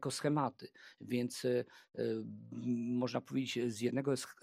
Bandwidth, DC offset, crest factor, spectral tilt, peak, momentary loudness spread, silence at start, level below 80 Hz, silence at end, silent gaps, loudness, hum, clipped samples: 15.5 kHz; under 0.1%; 18 dB; -5.5 dB/octave; -20 dBFS; 12 LU; 0 s; -84 dBFS; 0.1 s; none; -38 LUFS; none; under 0.1%